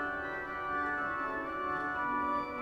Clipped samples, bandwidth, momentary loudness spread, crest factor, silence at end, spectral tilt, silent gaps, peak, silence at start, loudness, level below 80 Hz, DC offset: under 0.1%; 11 kHz; 4 LU; 12 dB; 0 s; -6 dB/octave; none; -22 dBFS; 0 s; -35 LUFS; -60 dBFS; under 0.1%